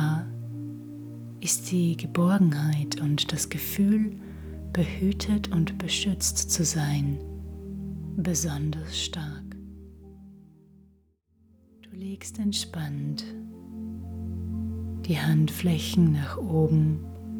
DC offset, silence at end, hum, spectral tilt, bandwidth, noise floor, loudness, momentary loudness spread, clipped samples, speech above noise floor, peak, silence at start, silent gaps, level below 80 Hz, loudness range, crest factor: under 0.1%; 0 s; none; -5 dB/octave; over 20 kHz; -64 dBFS; -27 LUFS; 16 LU; under 0.1%; 39 dB; -10 dBFS; 0 s; none; -48 dBFS; 10 LU; 18 dB